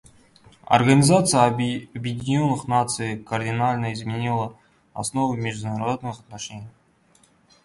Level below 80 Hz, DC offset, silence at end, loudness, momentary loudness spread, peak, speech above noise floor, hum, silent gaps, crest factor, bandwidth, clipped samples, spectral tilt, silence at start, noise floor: -56 dBFS; under 0.1%; 0.95 s; -22 LUFS; 18 LU; -2 dBFS; 37 dB; none; none; 22 dB; 11.5 kHz; under 0.1%; -5 dB/octave; 0.7 s; -59 dBFS